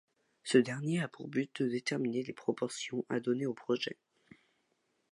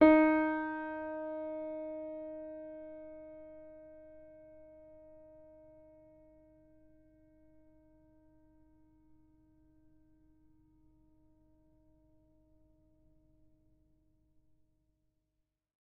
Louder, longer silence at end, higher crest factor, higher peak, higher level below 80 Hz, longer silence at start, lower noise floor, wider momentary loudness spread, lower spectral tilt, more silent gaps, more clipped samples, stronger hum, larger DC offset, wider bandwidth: about the same, -35 LUFS vs -35 LUFS; second, 1.2 s vs 10.65 s; about the same, 24 dB vs 28 dB; about the same, -12 dBFS vs -10 dBFS; second, -82 dBFS vs -68 dBFS; first, 0.45 s vs 0 s; second, -78 dBFS vs -85 dBFS; second, 8 LU vs 27 LU; about the same, -5.5 dB/octave vs -4.5 dB/octave; neither; neither; neither; neither; first, 11.5 kHz vs 4.4 kHz